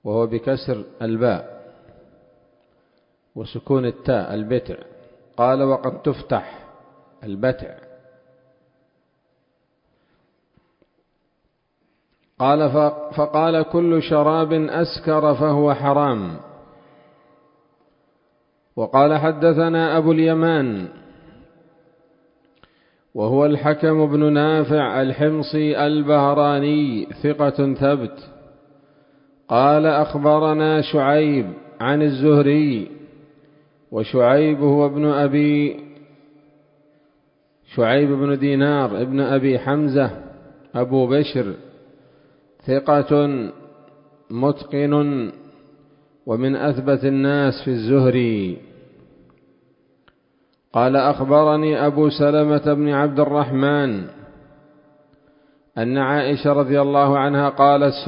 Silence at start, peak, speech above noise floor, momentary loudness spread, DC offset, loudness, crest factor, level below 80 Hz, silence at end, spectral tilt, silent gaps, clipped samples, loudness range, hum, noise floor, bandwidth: 0.05 s; 0 dBFS; 51 dB; 13 LU; under 0.1%; -18 LUFS; 18 dB; -56 dBFS; 0 s; -12 dB/octave; none; under 0.1%; 8 LU; none; -69 dBFS; 5.4 kHz